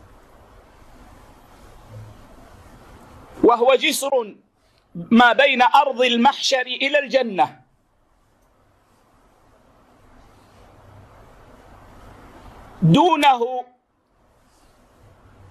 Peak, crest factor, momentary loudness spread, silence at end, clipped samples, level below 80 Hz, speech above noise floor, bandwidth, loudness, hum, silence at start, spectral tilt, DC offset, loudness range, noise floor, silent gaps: -4 dBFS; 18 dB; 10 LU; 1.9 s; under 0.1%; -54 dBFS; 46 dB; 13.5 kHz; -17 LUFS; none; 1.9 s; -4.5 dB/octave; under 0.1%; 8 LU; -62 dBFS; none